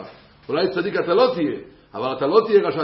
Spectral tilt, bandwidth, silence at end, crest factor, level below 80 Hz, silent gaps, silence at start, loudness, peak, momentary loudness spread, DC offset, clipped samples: -10.5 dB/octave; 5.8 kHz; 0 s; 18 dB; -60 dBFS; none; 0 s; -20 LUFS; -2 dBFS; 12 LU; under 0.1%; under 0.1%